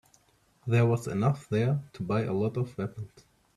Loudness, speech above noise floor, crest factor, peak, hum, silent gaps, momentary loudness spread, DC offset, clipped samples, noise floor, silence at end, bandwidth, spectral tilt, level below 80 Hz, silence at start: -29 LUFS; 37 dB; 18 dB; -12 dBFS; none; none; 13 LU; under 0.1%; under 0.1%; -66 dBFS; 0.5 s; 12 kHz; -8 dB/octave; -62 dBFS; 0.65 s